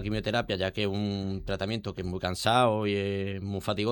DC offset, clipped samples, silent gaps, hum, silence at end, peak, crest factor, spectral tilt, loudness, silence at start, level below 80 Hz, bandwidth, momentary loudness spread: under 0.1%; under 0.1%; none; none; 0 s; -10 dBFS; 18 dB; -5.5 dB/octave; -29 LUFS; 0 s; -50 dBFS; 17.5 kHz; 9 LU